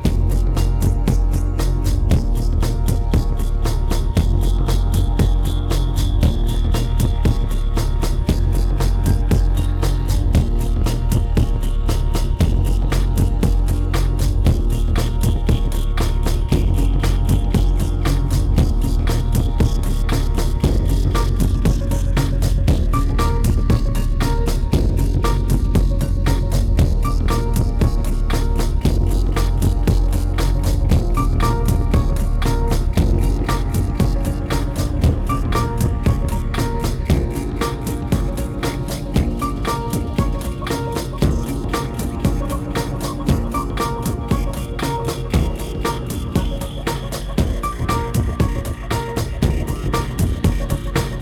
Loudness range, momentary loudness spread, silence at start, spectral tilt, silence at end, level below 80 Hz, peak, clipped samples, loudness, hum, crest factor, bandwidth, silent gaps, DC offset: 3 LU; 5 LU; 0 s; -6.5 dB/octave; 0 s; -18 dBFS; -4 dBFS; under 0.1%; -20 LUFS; none; 12 dB; 15.5 kHz; none; under 0.1%